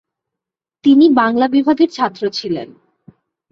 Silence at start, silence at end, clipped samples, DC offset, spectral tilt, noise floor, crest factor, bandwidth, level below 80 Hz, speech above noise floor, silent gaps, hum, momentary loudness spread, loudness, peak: 0.85 s; 0.85 s; under 0.1%; under 0.1%; -5.5 dB/octave; -84 dBFS; 14 dB; 6.8 kHz; -60 dBFS; 71 dB; none; none; 12 LU; -14 LUFS; -2 dBFS